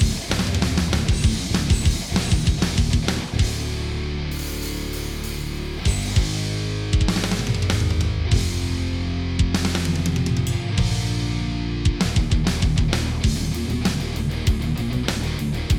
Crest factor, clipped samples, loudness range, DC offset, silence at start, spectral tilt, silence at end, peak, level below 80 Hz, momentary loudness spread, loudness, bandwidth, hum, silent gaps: 18 dB; under 0.1%; 4 LU; under 0.1%; 0 s; -5 dB/octave; 0 s; -2 dBFS; -26 dBFS; 6 LU; -23 LUFS; 18.5 kHz; none; none